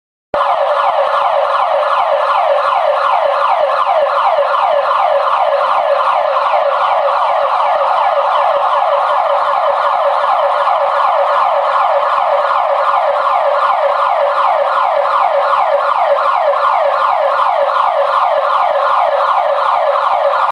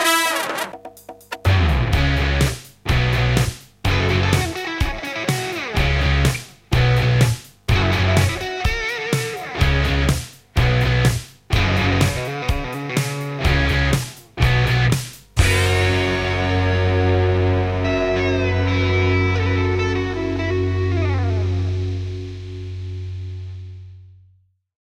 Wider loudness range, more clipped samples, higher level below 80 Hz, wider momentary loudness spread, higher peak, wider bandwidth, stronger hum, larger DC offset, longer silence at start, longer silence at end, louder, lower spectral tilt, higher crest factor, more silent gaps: second, 0 LU vs 4 LU; neither; second, -62 dBFS vs -28 dBFS; second, 1 LU vs 12 LU; about the same, -2 dBFS vs -2 dBFS; second, 10.5 kHz vs 16 kHz; neither; neither; first, 0.35 s vs 0 s; second, 0 s vs 0.9 s; first, -12 LUFS vs -20 LUFS; second, -2 dB/octave vs -5.5 dB/octave; second, 10 dB vs 18 dB; neither